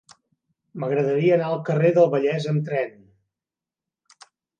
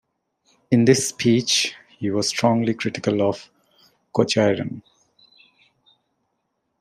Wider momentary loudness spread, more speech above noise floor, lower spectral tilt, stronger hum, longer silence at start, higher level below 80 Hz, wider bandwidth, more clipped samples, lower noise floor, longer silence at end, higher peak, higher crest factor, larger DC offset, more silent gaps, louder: about the same, 12 LU vs 10 LU; first, 69 dB vs 54 dB; first, -8 dB/octave vs -4.5 dB/octave; neither; about the same, 0.75 s vs 0.7 s; second, -72 dBFS vs -64 dBFS; second, 9 kHz vs 14.5 kHz; neither; first, -89 dBFS vs -74 dBFS; second, 1.7 s vs 2 s; second, -6 dBFS vs -2 dBFS; about the same, 18 dB vs 20 dB; neither; neither; about the same, -22 LUFS vs -21 LUFS